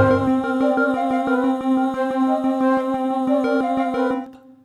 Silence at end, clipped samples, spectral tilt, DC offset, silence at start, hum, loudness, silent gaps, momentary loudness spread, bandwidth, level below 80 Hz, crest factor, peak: 0.25 s; under 0.1%; -7.5 dB/octave; under 0.1%; 0 s; none; -20 LUFS; none; 3 LU; 11 kHz; -54 dBFS; 16 dB; -4 dBFS